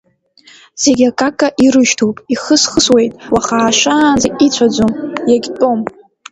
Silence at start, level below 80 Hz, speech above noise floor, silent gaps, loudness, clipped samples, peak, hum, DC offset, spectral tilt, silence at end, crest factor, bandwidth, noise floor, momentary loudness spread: 0.75 s; -44 dBFS; 35 dB; none; -12 LUFS; under 0.1%; 0 dBFS; none; under 0.1%; -3 dB/octave; 0.4 s; 12 dB; 11 kHz; -46 dBFS; 6 LU